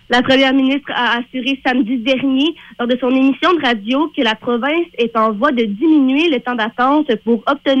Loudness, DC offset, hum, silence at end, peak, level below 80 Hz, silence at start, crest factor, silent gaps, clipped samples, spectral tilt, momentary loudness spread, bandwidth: -15 LUFS; under 0.1%; none; 0 s; -2 dBFS; -52 dBFS; 0.1 s; 12 dB; none; under 0.1%; -5 dB/octave; 6 LU; 8 kHz